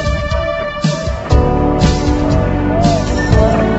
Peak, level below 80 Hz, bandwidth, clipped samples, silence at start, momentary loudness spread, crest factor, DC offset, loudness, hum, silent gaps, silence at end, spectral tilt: 0 dBFS; -18 dBFS; 8.2 kHz; under 0.1%; 0 s; 5 LU; 12 dB; under 0.1%; -14 LUFS; none; none; 0 s; -6.5 dB/octave